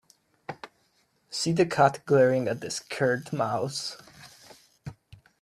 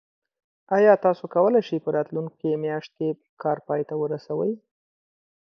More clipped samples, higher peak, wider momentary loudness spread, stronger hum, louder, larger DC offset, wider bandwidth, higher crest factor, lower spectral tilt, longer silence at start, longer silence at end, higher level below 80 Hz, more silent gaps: neither; about the same, -6 dBFS vs -4 dBFS; first, 23 LU vs 12 LU; neither; about the same, -26 LUFS vs -24 LUFS; neither; first, 14 kHz vs 6.4 kHz; about the same, 22 dB vs 20 dB; second, -5 dB/octave vs -8.5 dB/octave; second, 0.5 s vs 0.7 s; second, 0.5 s vs 0.85 s; first, -66 dBFS vs -76 dBFS; second, none vs 3.29-3.37 s